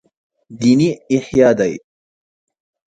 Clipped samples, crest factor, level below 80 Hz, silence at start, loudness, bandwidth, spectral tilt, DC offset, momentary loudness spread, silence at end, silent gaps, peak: under 0.1%; 18 dB; -52 dBFS; 0.5 s; -15 LUFS; 9.2 kHz; -6.5 dB/octave; under 0.1%; 8 LU; 1.1 s; none; 0 dBFS